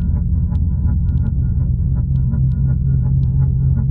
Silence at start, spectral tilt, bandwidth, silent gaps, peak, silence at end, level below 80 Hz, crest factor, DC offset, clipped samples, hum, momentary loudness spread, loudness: 0 s; -13.5 dB/octave; 1.5 kHz; none; -6 dBFS; 0 s; -20 dBFS; 10 dB; under 0.1%; under 0.1%; none; 2 LU; -17 LUFS